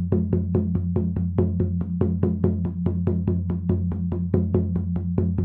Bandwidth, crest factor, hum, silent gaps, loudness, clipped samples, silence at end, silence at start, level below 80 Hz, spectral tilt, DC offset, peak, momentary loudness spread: 2.9 kHz; 18 dB; none; none; -24 LUFS; under 0.1%; 0 s; 0 s; -40 dBFS; -13.5 dB/octave; under 0.1%; -4 dBFS; 3 LU